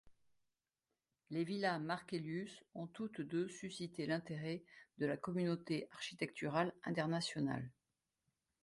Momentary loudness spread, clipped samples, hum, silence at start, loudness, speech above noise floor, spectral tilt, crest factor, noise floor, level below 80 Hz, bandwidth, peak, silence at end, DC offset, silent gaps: 8 LU; under 0.1%; none; 0.05 s; -42 LUFS; over 48 dB; -6 dB/octave; 20 dB; under -90 dBFS; -80 dBFS; 11.5 kHz; -24 dBFS; 0.9 s; under 0.1%; none